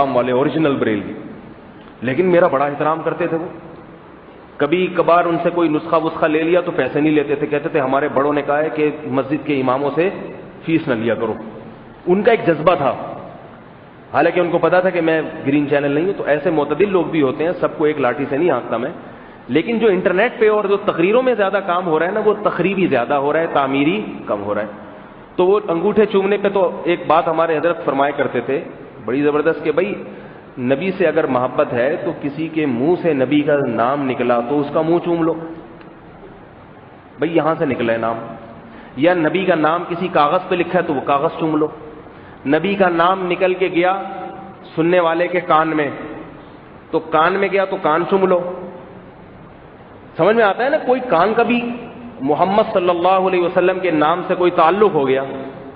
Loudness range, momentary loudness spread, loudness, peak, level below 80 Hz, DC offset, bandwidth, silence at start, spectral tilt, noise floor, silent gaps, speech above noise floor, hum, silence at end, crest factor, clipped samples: 3 LU; 14 LU; -17 LUFS; 0 dBFS; -54 dBFS; under 0.1%; 4.9 kHz; 0 s; -4.5 dB/octave; -40 dBFS; none; 24 dB; none; 0 s; 16 dB; under 0.1%